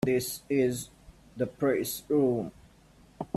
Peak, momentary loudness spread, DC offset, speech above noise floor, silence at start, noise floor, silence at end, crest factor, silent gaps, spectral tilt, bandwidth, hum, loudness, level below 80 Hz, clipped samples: -12 dBFS; 16 LU; under 0.1%; 29 dB; 0 s; -58 dBFS; 0.1 s; 18 dB; none; -5.5 dB/octave; 15.5 kHz; none; -29 LUFS; -60 dBFS; under 0.1%